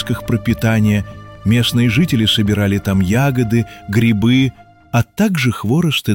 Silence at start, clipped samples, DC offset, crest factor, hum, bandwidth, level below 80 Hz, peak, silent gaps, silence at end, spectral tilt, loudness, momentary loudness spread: 0 s; under 0.1%; 0.2%; 12 dB; none; 17 kHz; -38 dBFS; -4 dBFS; none; 0 s; -6 dB/octave; -15 LUFS; 6 LU